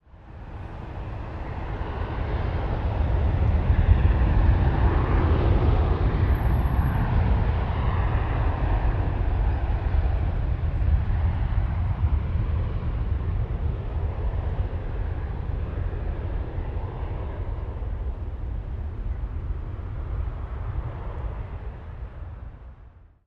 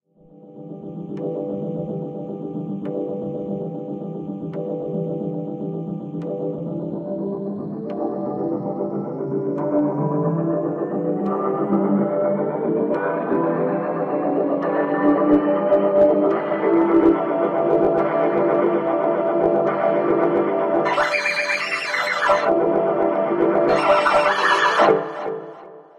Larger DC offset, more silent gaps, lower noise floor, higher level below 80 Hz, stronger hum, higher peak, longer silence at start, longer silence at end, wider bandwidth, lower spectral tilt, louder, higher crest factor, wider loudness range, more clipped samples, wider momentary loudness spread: neither; neither; about the same, -49 dBFS vs -47 dBFS; first, -26 dBFS vs -58 dBFS; neither; about the same, -4 dBFS vs -2 dBFS; second, 0.15 s vs 0.45 s; first, 0.4 s vs 0.15 s; second, 5 kHz vs 11 kHz; first, -9.5 dB/octave vs -6.5 dB/octave; second, -27 LUFS vs -21 LUFS; about the same, 20 dB vs 18 dB; about the same, 11 LU vs 10 LU; neither; about the same, 13 LU vs 12 LU